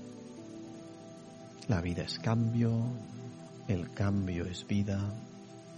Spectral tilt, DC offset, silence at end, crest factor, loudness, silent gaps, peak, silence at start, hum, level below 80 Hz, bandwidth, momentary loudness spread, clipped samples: -7 dB/octave; under 0.1%; 0 s; 20 dB; -34 LUFS; none; -16 dBFS; 0 s; none; -58 dBFS; 9.6 kHz; 18 LU; under 0.1%